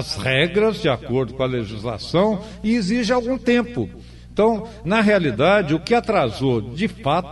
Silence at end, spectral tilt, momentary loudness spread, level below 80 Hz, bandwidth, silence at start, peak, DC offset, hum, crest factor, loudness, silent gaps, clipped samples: 0 s; -6 dB/octave; 9 LU; -42 dBFS; 11.5 kHz; 0 s; -6 dBFS; under 0.1%; none; 14 dB; -20 LUFS; none; under 0.1%